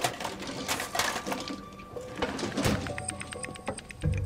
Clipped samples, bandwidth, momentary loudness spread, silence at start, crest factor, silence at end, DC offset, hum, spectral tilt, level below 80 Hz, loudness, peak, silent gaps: under 0.1%; 16 kHz; 10 LU; 0 s; 22 dB; 0 s; under 0.1%; none; -4 dB/octave; -46 dBFS; -33 LUFS; -12 dBFS; none